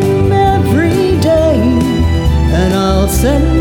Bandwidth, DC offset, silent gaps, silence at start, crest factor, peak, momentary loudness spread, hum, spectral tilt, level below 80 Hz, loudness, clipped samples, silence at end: 18.5 kHz; under 0.1%; none; 0 s; 10 dB; 0 dBFS; 2 LU; none; -6.5 dB/octave; -18 dBFS; -11 LUFS; under 0.1%; 0 s